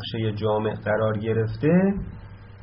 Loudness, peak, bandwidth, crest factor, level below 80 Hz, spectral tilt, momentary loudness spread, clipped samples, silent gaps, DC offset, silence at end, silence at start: -24 LUFS; -8 dBFS; 5.6 kHz; 16 dB; -46 dBFS; -6.5 dB/octave; 11 LU; under 0.1%; none; under 0.1%; 0 s; 0 s